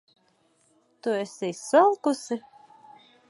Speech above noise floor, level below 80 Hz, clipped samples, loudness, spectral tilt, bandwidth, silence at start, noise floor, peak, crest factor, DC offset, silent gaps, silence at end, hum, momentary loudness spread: 42 dB; -84 dBFS; under 0.1%; -25 LUFS; -4.5 dB/octave; 11.5 kHz; 1.05 s; -66 dBFS; -6 dBFS; 22 dB; under 0.1%; none; 0.9 s; none; 14 LU